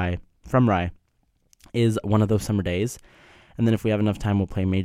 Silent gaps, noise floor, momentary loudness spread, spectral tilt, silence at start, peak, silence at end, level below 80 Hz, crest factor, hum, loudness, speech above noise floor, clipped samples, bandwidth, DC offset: none; -67 dBFS; 10 LU; -7 dB/octave; 0 s; -6 dBFS; 0 s; -44 dBFS; 18 dB; none; -24 LUFS; 45 dB; under 0.1%; 14.5 kHz; under 0.1%